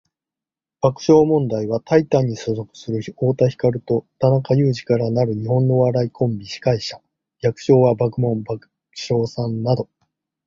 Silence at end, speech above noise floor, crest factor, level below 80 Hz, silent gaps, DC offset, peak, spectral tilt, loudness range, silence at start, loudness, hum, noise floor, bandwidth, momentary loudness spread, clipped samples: 0.6 s; 71 dB; 18 dB; -52 dBFS; none; under 0.1%; -2 dBFS; -7.5 dB/octave; 2 LU; 0.85 s; -19 LUFS; none; -89 dBFS; 7.4 kHz; 12 LU; under 0.1%